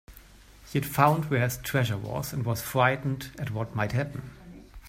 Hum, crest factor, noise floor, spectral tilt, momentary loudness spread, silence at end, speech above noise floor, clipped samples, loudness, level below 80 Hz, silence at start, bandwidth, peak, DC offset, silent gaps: none; 24 dB; -52 dBFS; -5.5 dB/octave; 12 LU; 0 s; 24 dB; under 0.1%; -28 LUFS; -52 dBFS; 0.1 s; 16 kHz; -4 dBFS; under 0.1%; none